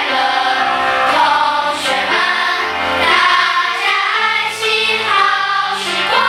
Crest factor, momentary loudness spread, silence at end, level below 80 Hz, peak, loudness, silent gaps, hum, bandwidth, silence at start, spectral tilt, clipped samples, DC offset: 14 dB; 4 LU; 0 s; -54 dBFS; 0 dBFS; -13 LUFS; none; none; 18.5 kHz; 0 s; -1 dB/octave; under 0.1%; under 0.1%